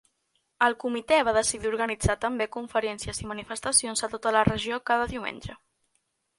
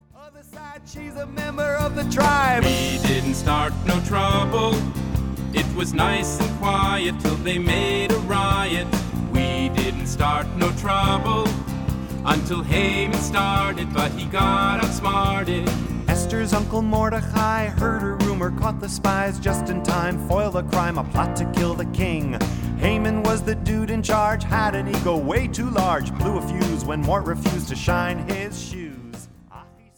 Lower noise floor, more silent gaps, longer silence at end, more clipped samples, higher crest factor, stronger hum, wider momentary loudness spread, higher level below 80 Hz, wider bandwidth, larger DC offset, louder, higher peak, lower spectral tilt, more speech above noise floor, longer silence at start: first, -75 dBFS vs -46 dBFS; neither; first, 0.85 s vs 0.35 s; neither; about the same, 22 dB vs 18 dB; neither; first, 11 LU vs 6 LU; second, -48 dBFS vs -32 dBFS; second, 11.5 kHz vs 19.5 kHz; neither; second, -26 LUFS vs -22 LUFS; about the same, -6 dBFS vs -4 dBFS; second, -3 dB/octave vs -5.5 dB/octave; first, 48 dB vs 25 dB; first, 0.6 s vs 0.2 s